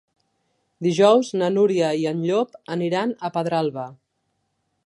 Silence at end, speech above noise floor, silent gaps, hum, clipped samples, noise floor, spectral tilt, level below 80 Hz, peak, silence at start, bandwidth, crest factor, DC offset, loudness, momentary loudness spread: 0.95 s; 53 dB; none; none; under 0.1%; -73 dBFS; -6 dB/octave; -74 dBFS; -4 dBFS; 0.8 s; 11 kHz; 18 dB; under 0.1%; -21 LUFS; 11 LU